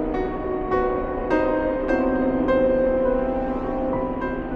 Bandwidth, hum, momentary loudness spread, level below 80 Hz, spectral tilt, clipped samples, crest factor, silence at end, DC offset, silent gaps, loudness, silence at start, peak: 6.4 kHz; none; 6 LU; -36 dBFS; -9 dB/octave; under 0.1%; 14 dB; 0 s; under 0.1%; none; -23 LUFS; 0 s; -8 dBFS